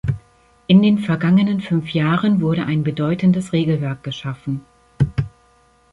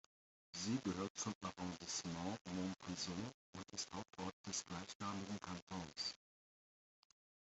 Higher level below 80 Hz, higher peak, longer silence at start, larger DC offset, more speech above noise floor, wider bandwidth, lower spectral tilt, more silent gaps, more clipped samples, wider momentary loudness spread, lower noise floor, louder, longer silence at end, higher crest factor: first, -44 dBFS vs -78 dBFS; first, -2 dBFS vs -30 dBFS; second, 0.05 s vs 0.55 s; neither; second, 38 dB vs over 43 dB; first, 11 kHz vs 8.2 kHz; first, -8 dB/octave vs -3.5 dB/octave; second, none vs 1.10-1.15 s, 1.35-1.41 s, 2.41-2.45 s, 3.34-3.53 s, 4.33-4.44 s, 4.95-5.00 s, 5.62-5.67 s; neither; first, 13 LU vs 7 LU; second, -55 dBFS vs under -90 dBFS; first, -18 LUFS vs -47 LUFS; second, 0.65 s vs 1.35 s; about the same, 16 dB vs 18 dB